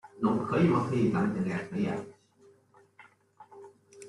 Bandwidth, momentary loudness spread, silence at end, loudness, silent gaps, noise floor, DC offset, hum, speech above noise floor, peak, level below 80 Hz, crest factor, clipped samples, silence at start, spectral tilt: 11.5 kHz; 21 LU; 0 s; -29 LUFS; none; -62 dBFS; under 0.1%; none; 34 dB; -14 dBFS; -64 dBFS; 18 dB; under 0.1%; 0.05 s; -8 dB/octave